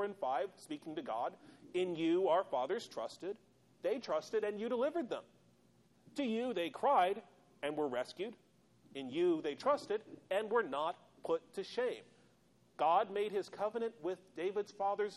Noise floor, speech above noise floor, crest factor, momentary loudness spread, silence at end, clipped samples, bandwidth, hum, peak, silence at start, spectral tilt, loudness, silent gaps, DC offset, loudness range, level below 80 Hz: -70 dBFS; 33 dB; 18 dB; 12 LU; 0 s; under 0.1%; 12.5 kHz; none; -20 dBFS; 0 s; -5 dB/octave; -38 LUFS; none; under 0.1%; 2 LU; -84 dBFS